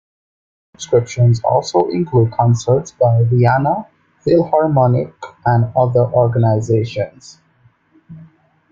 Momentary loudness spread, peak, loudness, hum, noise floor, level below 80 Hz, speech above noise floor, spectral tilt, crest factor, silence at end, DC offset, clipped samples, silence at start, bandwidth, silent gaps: 9 LU; 0 dBFS; -15 LUFS; none; -54 dBFS; -50 dBFS; 40 dB; -7.5 dB/octave; 16 dB; 0.5 s; under 0.1%; under 0.1%; 0.8 s; 7.6 kHz; none